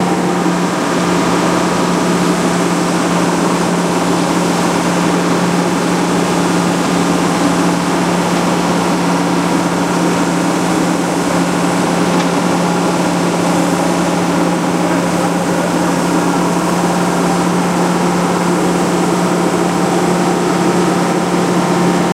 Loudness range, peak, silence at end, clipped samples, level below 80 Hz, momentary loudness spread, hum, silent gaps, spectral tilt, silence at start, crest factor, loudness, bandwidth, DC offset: 0 LU; -2 dBFS; 0 s; under 0.1%; -44 dBFS; 1 LU; none; none; -5 dB/octave; 0 s; 12 dB; -14 LUFS; 15.5 kHz; under 0.1%